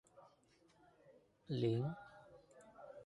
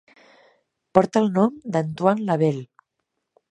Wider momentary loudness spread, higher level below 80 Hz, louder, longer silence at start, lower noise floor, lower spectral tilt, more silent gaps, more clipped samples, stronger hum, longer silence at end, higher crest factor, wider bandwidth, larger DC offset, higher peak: first, 25 LU vs 7 LU; second, -78 dBFS vs -64 dBFS; second, -41 LUFS vs -21 LUFS; second, 0.15 s vs 0.95 s; second, -72 dBFS vs -79 dBFS; about the same, -8.5 dB/octave vs -8 dB/octave; neither; neither; neither; second, 0 s vs 0.85 s; about the same, 20 dB vs 22 dB; about the same, 11 kHz vs 10.5 kHz; neither; second, -26 dBFS vs 0 dBFS